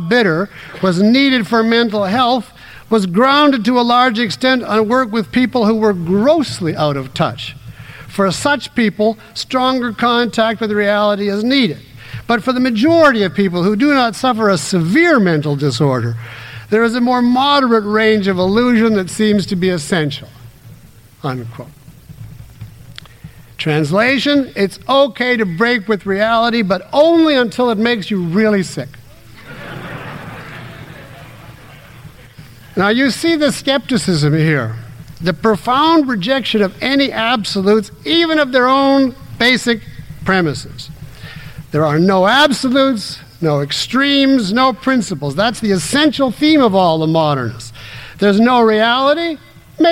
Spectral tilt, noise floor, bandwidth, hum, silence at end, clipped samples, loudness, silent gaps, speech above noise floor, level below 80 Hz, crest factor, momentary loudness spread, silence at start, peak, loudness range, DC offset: -5.5 dB/octave; -41 dBFS; 16.5 kHz; none; 0 s; under 0.1%; -14 LUFS; none; 28 dB; -46 dBFS; 14 dB; 17 LU; 0 s; -2 dBFS; 7 LU; under 0.1%